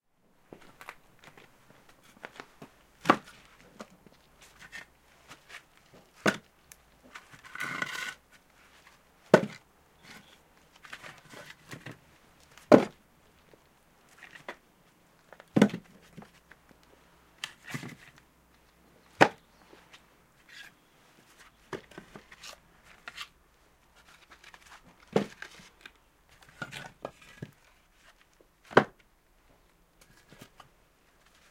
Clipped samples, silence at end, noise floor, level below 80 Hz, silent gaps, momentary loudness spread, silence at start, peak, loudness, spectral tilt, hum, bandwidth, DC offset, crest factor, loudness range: under 0.1%; 2.65 s; -66 dBFS; -68 dBFS; none; 29 LU; 2.25 s; -2 dBFS; -29 LUFS; -5.5 dB/octave; none; 16.5 kHz; under 0.1%; 34 dB; 17 LU